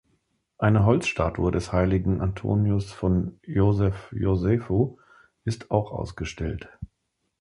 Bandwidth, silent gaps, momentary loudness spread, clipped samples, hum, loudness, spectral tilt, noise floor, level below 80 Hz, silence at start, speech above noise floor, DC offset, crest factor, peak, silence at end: 11 kHz; none; 11 LU; under 0.1%; none; -25 LUFS; -7.5 dB/octave; -77 dBFS; -38 dBFS; 0.6 s; 53 dB; under 0.1%; 20 dB; -6 dBFS; 0.55 s